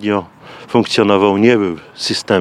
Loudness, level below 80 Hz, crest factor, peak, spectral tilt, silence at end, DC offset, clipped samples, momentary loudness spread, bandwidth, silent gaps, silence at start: -14 LUFS; -60 dBFS; 14 dB; 0 dBFS; -5 dB/octave; 0 s; under 0.1%; under 0.1%; 10 LU; 12.5 kHz; none; 0 s